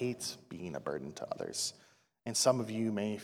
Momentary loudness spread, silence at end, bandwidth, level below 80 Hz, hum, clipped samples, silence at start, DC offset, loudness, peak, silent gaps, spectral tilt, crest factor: 13 LU; 0 s; 17 kHz; -74 dBFS; none; under 0.1%; 0 s; under 0.1%; -35 LUFS; -14 dBFS; none; -3.5 dB/octave; 22 dB